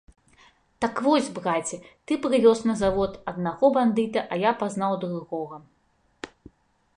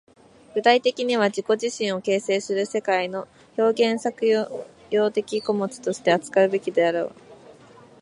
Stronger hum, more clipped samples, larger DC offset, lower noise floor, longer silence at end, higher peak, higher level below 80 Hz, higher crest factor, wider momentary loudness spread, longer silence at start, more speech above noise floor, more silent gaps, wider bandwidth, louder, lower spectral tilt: neither; neither; neither; first, -67 dBFS vs -49 dBFS; first, 0.7 s vs 0.5 s; second, -8 dBFS vs -4 dBFS; first, -54 dBFS vs -72 dBFS; about the same, 18 dB vs 20 dB; first, 19 LU vs 9 LU; first, 0.8 s vs 0.55 s; first, 43 dB vs 27 dB; neither; about the same, 11 kHz vs 11.5 kHz; about the same, -24 LUFS vs -23 LUFS; first, -5.5 dB/octave vs -4 dB/octave